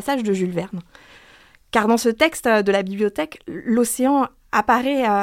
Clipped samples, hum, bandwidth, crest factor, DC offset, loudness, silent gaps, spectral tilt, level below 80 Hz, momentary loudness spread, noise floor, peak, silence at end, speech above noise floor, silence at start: under 0.1%; none; 16.5 kHz; 20 dB; under 0.1%; -20 LUFS; none; -4.5 dB/octave; -54 dBFS; 11 LU; -50 dBFS; -2 dBFS; 0 s; 31 dB; 0 s